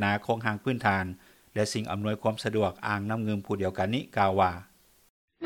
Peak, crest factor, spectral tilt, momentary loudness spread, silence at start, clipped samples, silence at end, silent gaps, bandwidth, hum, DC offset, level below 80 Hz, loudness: -8 dBFS; 20 dB; -5.5 dB/octave; 5 LU; 0 s; under 0.1%; 0 s; 5.10-5.28 s; 18 kHz; none; under 0.1%; -62 dBFS; -29 LUFS